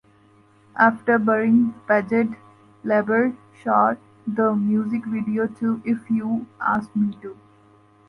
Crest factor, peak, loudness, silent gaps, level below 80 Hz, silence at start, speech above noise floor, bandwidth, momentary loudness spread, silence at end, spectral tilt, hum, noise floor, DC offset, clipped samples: 18 dB; -4 dBFS; -22 LUFS; none; -64 dBFS; 0.75 s; 34 dB; 5.4 kHz; 11 LU; 0.75 s; -9 dB/octave; none; -55 dBFS; under 0.1%; under 0.1%